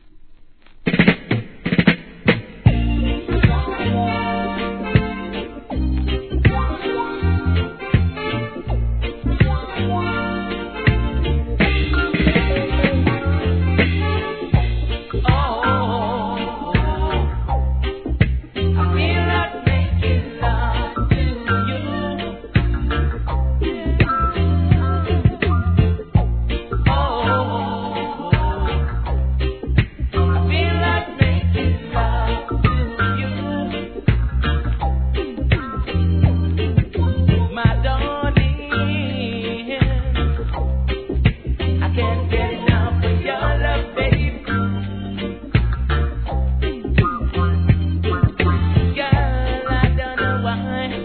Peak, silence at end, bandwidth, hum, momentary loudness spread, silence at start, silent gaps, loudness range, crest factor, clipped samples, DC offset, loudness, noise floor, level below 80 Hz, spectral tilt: 0 dBFS; 0 s; 4.5 kHz; none; 6 LU; 0.05 s; none; 3 LU; 18 dB; under 0.1%; 0.1%; -20 LUFS; -42 dBFS; -24 dBFS; -10.5 dB/octave